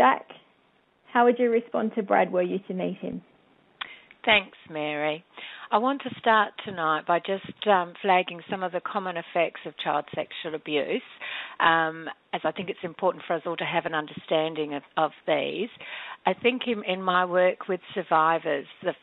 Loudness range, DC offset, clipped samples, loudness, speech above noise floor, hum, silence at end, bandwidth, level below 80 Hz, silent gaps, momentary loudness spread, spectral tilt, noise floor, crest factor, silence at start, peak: 3 LU; under 0.1%; under 0.1%; -26 LUFS; 38 dB; none; 0.05 s; 4.3 kHz; -70 dBFS; none; 12 LU; -8.5 dB/octave; -65 dBFS; 20 dB; 0 s; -8 dBFS